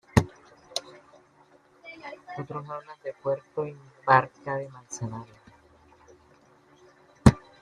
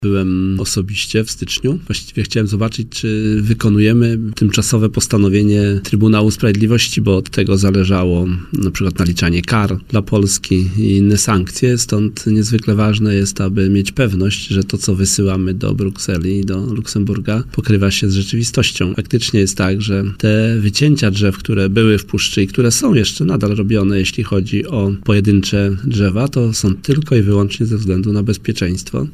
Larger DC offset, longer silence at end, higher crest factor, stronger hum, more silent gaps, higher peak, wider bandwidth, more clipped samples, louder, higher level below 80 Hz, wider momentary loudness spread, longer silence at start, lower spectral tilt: neither; first, 0.25 s vs 0 s; first, 28 dB vs 12 dB; neither; neither; about the same, -2 dBFS vs -2 dBFS; second, 13.5 kHz vs 15.5 kHz; neither; second, -28 LUFS vs -15 LUFS; second, -46 dBFS vs -36 dBFS; first, 21 LU vs 6 LU; first, 0.15 s vs 0 s; about the same, -6 dB/octave vs -5.5 dB/octave